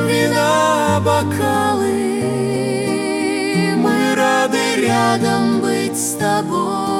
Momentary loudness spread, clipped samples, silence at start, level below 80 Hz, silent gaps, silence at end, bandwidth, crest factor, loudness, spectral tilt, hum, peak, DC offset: 4 LU; under 0.1%; 0 s; -56 dBFS; none; 0 s; 17.5 kHz; 14 dB; -16 LUFS; -4.5 dB/octave; none; -2 dBFS; under 0.1%